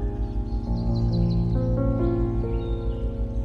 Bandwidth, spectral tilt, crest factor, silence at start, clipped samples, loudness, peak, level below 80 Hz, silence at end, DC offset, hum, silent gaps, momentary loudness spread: 5.6 kHz; -10.5 dB/octave; 12 dB; 0 s; under 0.1%; -26 LUFS; -12 dBFS; -28 dBFS; 0 s; under 0.1%; none; none; 6 LU